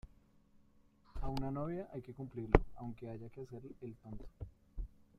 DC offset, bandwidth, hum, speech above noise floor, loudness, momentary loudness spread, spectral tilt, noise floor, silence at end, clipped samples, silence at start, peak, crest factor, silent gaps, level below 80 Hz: under 0.1%; 12.5 kHz; none; 28 dB; -41 LUFS; 19 LU; -8.5 dB/octave; -67 dBFS; 0.3 s; under 0.1%; 0.05 s; -8 dBFS; 34 dB; none; -46 dBFS